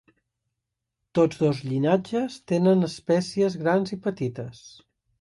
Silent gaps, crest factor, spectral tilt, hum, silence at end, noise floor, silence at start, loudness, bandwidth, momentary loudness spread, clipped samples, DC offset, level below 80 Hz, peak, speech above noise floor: none; 16 dB; -7 dB/octave; none; 0.55 s; -83 dBFS; 1.15 s; -24 LUFS; 11.5 kHz; 9 LU; under 0.1%; under 0.1%; -64 dBFS; -8 dBFS; 59 dB